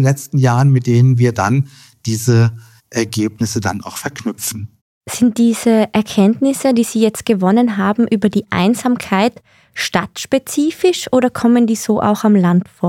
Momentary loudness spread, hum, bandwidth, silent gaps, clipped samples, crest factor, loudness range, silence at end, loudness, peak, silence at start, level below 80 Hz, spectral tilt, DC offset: 10 LU; none; 16.5 kHz; 4.81-5.01 s; under 0.1%; 14 dB; 4 LU; 0 s; -15 LUFS; 0 dBFS; 0 s; -54 dBFS; -6 dB/octave; under 0.1%